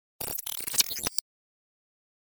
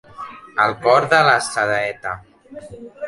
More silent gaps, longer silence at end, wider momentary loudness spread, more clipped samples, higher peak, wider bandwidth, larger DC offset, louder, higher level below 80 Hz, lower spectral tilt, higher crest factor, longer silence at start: neither; first, 1.15 s vs 0 s; second, 8 LU vs 22 LU; neither; second, -6 dBFS vs -2 dBFS; first, over 20 kHz vs 11.5 kHz; neither; second, -28 LUFS vs -17 LUFS; about the same, -60 dBFS vs -56 dBFS; second, 0.5 dB/octave vs -3.5 dB/octave; first, 28 dB vs 18 dB; about the same, 0.2 s vs 0.2 s